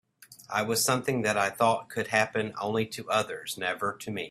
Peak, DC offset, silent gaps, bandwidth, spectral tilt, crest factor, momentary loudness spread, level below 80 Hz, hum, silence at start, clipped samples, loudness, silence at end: -8 dBFS; under 0.1%; none; 16 kHz; -3.5 dB/octave; 20 dB; 7 LU; -68 dBFS; none; 0.3 s; under 0.1%; -28 LUFS; 0 s